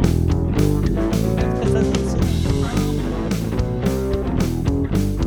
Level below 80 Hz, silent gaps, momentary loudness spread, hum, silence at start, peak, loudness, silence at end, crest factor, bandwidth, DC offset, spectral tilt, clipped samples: -26 dBFS; none; 4 LU; none; 0 s; -2 dBFS; -20 LUFS; 0 s; 18 dB; over 20 kHz; under 0.1%; -7 dB/octave; under 0.1%